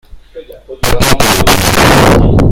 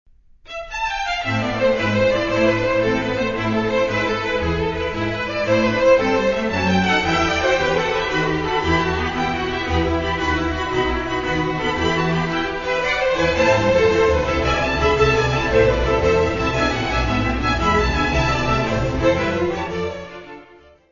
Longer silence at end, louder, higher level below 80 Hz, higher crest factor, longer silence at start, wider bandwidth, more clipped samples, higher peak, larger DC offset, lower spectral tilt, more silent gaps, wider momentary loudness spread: second, 0 s vs 0.45 s; first, -8 LUFS vs -19 LUFS; first, -18 dBFS vs -32 dBFS; second, 8 dB vs 16 dB; second, 0.1 s vs 0.5 s; first, over 20 kHz vs 7.4 kHz; first, 2% vs under 0.1%; first, 0 dBFS vs -4 dBFS; neither; about the same, -4.5 dB/octave vs -5.5 dB/octave; neither; about the same, 7 LU vs 6 LU